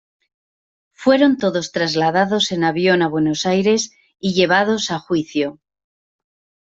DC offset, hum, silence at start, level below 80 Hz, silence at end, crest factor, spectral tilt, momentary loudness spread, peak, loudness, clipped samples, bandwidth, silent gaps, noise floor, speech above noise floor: under 0.1%; none; 1 s; -60 dBFS; 1.2 s; 16 dB; -4.5 dB/octave; 7 LU; -2 dBFS; -18 LUFS; under 0.1%; 8 kHz; none; under -90 dBFS; over 73 dB